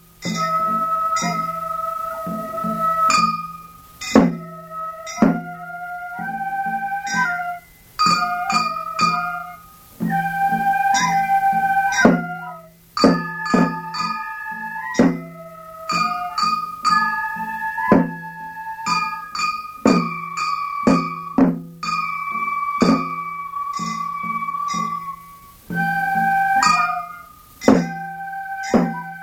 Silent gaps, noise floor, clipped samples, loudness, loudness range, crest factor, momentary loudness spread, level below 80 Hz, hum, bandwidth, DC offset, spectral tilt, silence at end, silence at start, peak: none; -43 dBFS; under 0.1%; -20 LUFS; 4 LU; 20 dB; 14 LU; -52 dBFS; none; 19 kHz; under 0.1%; -4.5 dB/octave; 0 s; 0.2 s; 0 dBFS